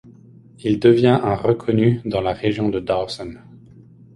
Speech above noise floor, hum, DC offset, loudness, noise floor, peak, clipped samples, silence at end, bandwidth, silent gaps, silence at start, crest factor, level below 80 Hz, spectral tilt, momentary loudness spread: 28 dB; none; under 0.1%; -19 LUFS; -46 dBFS; -2 dBFS; under 0.1%; 0.8 s; 11.5 kHz; none; 0.65 s; 18 dB; -48 dBFS; -8 dB/octave; 13 LU